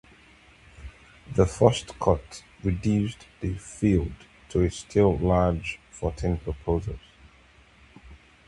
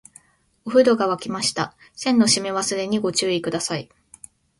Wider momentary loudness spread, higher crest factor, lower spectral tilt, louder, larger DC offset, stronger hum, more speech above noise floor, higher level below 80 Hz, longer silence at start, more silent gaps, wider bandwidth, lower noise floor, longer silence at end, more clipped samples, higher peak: first, 16 LU vs 11 LU; first, 24 dB vs 18 dB; first, -7 dB/octave vs -3.5 dB/octave; second, -26 LUFS vs -21 LUFS; neither; neither; about the same, 31 dB vs 33 dB; first, -38 dBFS vs -62 dBFS; first, 0.8 s vs 0.65 s; neither; about the same, 11.5 kHz vs 11.5 kHz; about the same, -56 dBFS vs -54 dBFS; second, 0.35 s vs 0.75 s; neither; about the same, -2 dBFS vs -4 dBFS